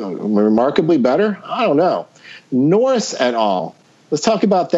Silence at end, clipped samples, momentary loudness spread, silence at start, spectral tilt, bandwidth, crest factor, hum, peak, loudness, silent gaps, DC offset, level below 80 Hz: 0 s; under 0.1%; 9 LU; 0 s; -5.5 dB/octave; 8 kHz; 16 dB; none; -2 dBFS; -16 LUFS; none; under 0.1%; -62 dBFS